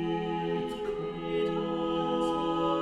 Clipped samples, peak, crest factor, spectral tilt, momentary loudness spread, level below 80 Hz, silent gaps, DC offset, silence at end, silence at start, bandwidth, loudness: under 0.1%; -18 dBFS; 12 dB; -7 dB/octave; 5 LU; -54 dBFS; none; under 0.1%; 0 s; 0 s; 11 kHz; -31 LUFS